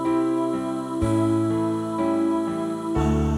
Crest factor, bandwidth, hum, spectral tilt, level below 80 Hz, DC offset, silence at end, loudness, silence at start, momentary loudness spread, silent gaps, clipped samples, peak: 14 dB; 12 kHz; none; -7.5 dB/octave; -36 dBFS; under 0.1%; 0 s; -24 LUFS; 0 s; 5 LU; none; under 0.1%; -10 dBFS